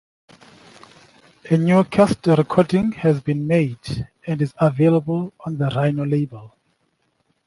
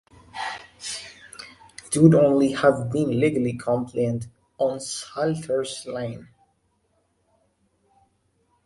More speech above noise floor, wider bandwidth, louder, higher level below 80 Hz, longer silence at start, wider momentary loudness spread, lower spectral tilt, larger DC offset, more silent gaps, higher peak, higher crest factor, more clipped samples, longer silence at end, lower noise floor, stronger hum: about the same, 49 dB vs 47 dB; about the same, 11.5 kHz vs 11.5 kHz; first, -19 LUFS vs -23 LUFS; first, -52 dBFS vs -58 dBFS; first, 1.45 s vs 0.35 s; second, 12 LU vs 23 LU; first, -8 dB/octave vs -6 dB/octave; neither; neither; about the same, -2 dBFS vs -2 dBFS; second, 18 dB vs 24 dB; neither; second, 1 s vs 2.4 s; about the same, -67 dBFS vs -69 dBFS; neither